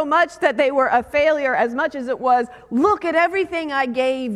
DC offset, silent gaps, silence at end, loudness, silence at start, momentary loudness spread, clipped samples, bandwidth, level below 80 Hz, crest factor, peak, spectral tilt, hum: under 0.1%; none; 0 s; -19 LUFS; 0 s; 5 LU; under 0.1%; 12.5 kHz; -54 dBFS; 18 dB; -2 dBFS; -4.5 dB/octave; none